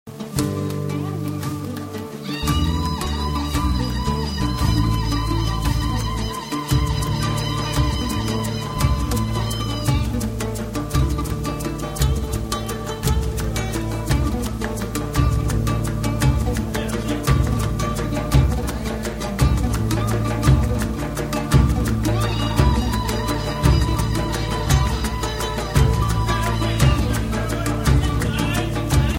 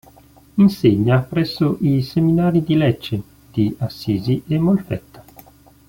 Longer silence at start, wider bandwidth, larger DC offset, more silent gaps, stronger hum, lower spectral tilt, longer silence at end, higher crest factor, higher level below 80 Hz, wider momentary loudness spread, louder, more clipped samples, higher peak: second, 0.05 s vs 0.55 s; about the same, 16.5 kHz vs 17 kHz; neither; neither; neither; second, -5.5 dB/octave vs -8.5 dB/octave; second, 0 s vs 0.7 s; about the same, 18 dB vs 16 dB; first, -26 dBFS vs -48 dBFS; second, 7 LU vs 12 LU; second, -22 LUFS vs -18 LUFS; neither; about the same, -2 dBFS vs -2 dBFS